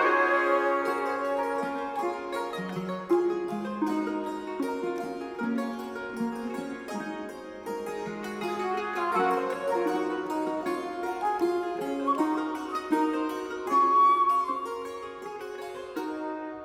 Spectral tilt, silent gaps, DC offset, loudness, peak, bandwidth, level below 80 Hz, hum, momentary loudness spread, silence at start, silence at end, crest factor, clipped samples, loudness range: -5.5 dB/octave; none; under 0.1%; -29 LUFS; -12 dBFS; 15.5 kHz; -66 dBFS; none; 12 LU; 0 s; 0 s; 18 dB; under 0.1%; 8 LU